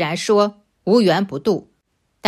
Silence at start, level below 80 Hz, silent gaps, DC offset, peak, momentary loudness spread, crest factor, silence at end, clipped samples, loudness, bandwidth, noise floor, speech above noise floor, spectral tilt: 0 s; -62 dBFS; none; under 0.1%; -2 dBFS; 9 LU; 18 dB; 0 s; under 0.1%; -18 LUFS; 14 kHz; -68 dBFS; 51 dB; -5.5 dB/octave